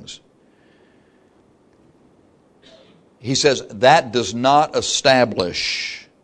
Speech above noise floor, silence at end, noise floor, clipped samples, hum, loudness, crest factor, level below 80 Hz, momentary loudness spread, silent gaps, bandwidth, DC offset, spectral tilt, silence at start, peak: 38 dB; 0.2 s; -55 dBFS; under 0.1%; none; -17 LUFS; 20 dB; -56 dBFS; 14 LU; none; 10.5 kHz; under 0.1%; -3 dB/octave; 0 s; 0 dBFS